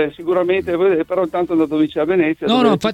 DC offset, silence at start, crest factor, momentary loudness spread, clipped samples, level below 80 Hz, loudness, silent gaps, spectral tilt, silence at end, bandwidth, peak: under 0.1%; 0 s; 16 dB; 4 LU; under 0.1%; -52 dBFS; -17 LUFS; none; -6.5 dB/octave; 0 s; 12 kHz; 0 dBFS